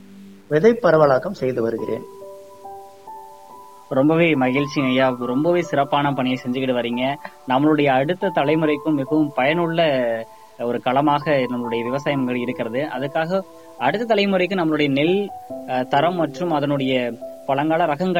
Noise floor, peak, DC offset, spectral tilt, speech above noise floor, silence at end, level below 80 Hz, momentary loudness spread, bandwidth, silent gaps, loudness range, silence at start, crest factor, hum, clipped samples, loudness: -43 dBFS; -4 dBFS; 0.3%; -7 dB/octave; 23 dB; 0 s; -60 dBFS; 13 LU; 16.5 kHz; none; 3 LU; 0.1 s; 16 dB; none; under 0.1%; -20 LUFS